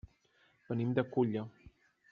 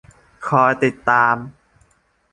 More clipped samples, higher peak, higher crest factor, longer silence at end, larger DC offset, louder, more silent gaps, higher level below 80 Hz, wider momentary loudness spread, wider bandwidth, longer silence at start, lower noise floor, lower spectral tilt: neither; second, -16 dBFS vs -2 dBFS; about the same, 20 dB vs 18 dB; second, 0.4 s vs 0.85 s; neither; second, -35 LUFS vs -17 LUFS; neither; second, -66 dBFS vs -56 dBFS; second, 9 LU vs 14 LU; second, 5.2 kHz vs 11 kHz; first, 0.7 s vs 0.4 s; first, -71 dBFS vs -60 dBFS; about the same, -7.5 dB/octave vs -6.5 dB/octave